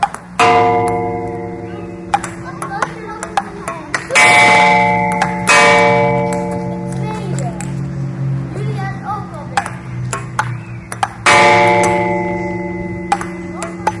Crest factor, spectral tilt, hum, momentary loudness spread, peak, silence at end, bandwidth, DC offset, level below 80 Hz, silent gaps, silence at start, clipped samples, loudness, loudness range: 16 dB; -4 dB/octave; none; 17 LU; 0 dBFS; 0 s; 11.5 kHz; under 0.1%; -42 dBFS; none; 0 s; under 0.1%; -14 LUFS; 11 LU